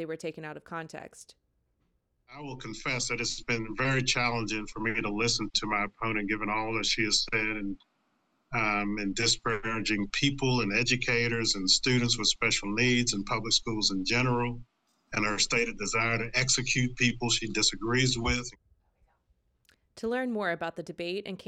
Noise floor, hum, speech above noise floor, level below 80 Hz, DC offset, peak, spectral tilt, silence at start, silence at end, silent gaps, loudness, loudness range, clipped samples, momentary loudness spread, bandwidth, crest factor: -75 dBFS; none; 45 dB; -48 dBFS; under 0.1%; -12 dBFS; -3 dB/octave; 0 s; 0.05 s; none; -28 LUFS; 6 LU; under 0.1%; 13 LU; 10.5 kHz; 20 dB